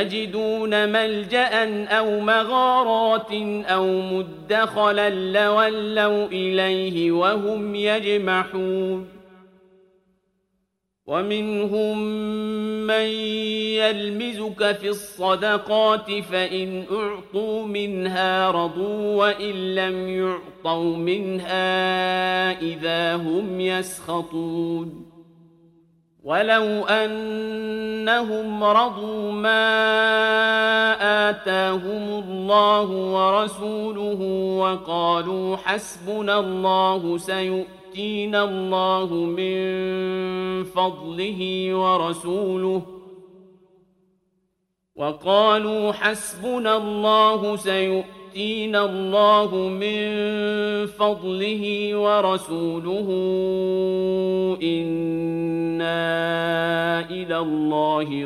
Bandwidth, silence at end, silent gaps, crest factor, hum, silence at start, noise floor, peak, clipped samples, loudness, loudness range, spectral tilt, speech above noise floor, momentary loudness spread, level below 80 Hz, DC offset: 14.5 kHz; 0 s; none; 18 dB; none; 0 s; -75 dBFS; -4 dBFS; under 0.1%; -22 LUFS; 6 LU; -5 dB/octave; 53 dB; 9 LU; -62 dBFS; under 0.1%